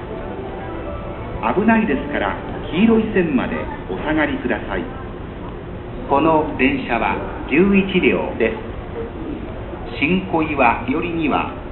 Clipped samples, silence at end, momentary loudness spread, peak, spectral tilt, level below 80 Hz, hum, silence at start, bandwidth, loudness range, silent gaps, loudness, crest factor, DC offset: under 0.1%; 0 s; 14 LU; 0 dBFS; -11.5 dB/octave; -34 dBFS; none; 0 s; 4.2 kHz; 3 LU; none; -19 LUFS; 18 dB; under 0.1%